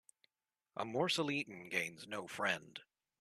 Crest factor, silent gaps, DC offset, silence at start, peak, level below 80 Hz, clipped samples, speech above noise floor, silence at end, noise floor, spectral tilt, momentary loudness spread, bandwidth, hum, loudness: 22 dB; none; under 0.1%; 0.75 s; -18 dBFS; -82 dBFS; under 0.1%; over 50 dB; 0.35 s; under -90 dBFS; -3.5 dB/octave; 14 LU; 14 kHz; none; -39 LUFS